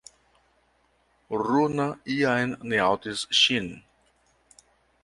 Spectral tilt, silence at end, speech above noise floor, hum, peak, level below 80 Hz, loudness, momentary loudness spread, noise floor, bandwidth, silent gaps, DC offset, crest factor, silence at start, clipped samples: -3.5 dB/octave; 1.25 s; 42 dB; none; -6 dBFS; -62 dBFS; -24 LUFS; 10 LU; -67 dBFS; 11.5 kHz; none; under 0.1%; 22 dB; 1.3 s; under 0.1%